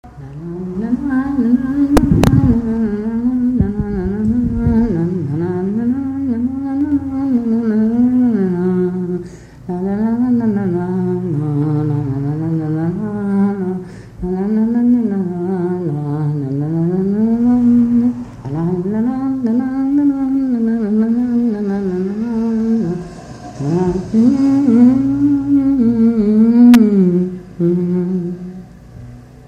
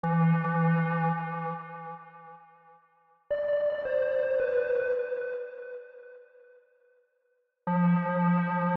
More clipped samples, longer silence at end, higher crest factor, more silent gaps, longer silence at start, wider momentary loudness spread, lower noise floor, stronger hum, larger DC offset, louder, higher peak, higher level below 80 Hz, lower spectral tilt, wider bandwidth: neither; about the same, 0.05 s vs 0 s; about the same, 14 dB vs 12 dB; neither; about the same, 0.05 s vs 0.05 s; second, 11 LU vs 18 LU; second, -35 dBFS vs -74 dBFS; neither; neither; first, -15 LUFS vs -28 LUFS; first, 0 dBFS vs -18 dBFS; first, -34 dBFS vs -70 dBFS; second, -9 dB/octave vs -11 dB/octave; first, 11 kHz vs 4 kHz